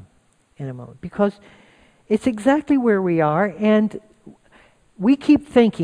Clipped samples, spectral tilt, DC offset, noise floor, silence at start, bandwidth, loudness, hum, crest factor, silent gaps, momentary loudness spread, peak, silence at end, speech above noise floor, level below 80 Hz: under 0.1%; -7.5 dB/octave; under 0.1%; -60 dBFS; 0.6 s; 10.5 kHz; -19 LUFS; none; 16 dB; none; 17 LU; -4 dBFS; 0 s; 41 dB; -54 dBFS